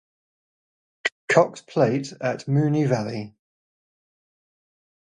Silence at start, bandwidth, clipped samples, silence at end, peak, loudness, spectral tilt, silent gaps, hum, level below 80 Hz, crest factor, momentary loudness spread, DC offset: 1.05 s; 10 kHz; under 0.1%; 1.75 s; -4 dBFS; -23 LUFS; -6.5 dB/octave; 1.12-1.28 s; none; -68 dBFS; 22 dB; 10 LU; under 0.1%